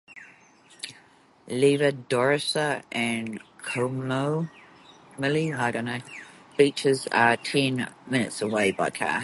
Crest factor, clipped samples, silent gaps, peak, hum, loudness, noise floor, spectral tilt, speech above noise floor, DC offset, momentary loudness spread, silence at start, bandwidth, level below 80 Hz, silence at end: 20 dB; under 0.1%; none; -6 dBFS; none; -25 LUFS; -57 dBFS; -5 dB/octave; 32 dB; under 0.1%; 16 LU; 0.1 s; 11.5 kHz; -68 dBFS; 0 s